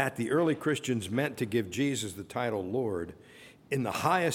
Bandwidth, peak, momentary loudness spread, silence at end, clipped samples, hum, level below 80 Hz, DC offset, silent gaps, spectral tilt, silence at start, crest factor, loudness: 17.5 kHz; -12 dBFS; 8 LU; 0 s; under 0.1%; none; -66 dBFS; under 0.1%; none; -5 dB/octave; 0 s; 18 dB; -31 LUFS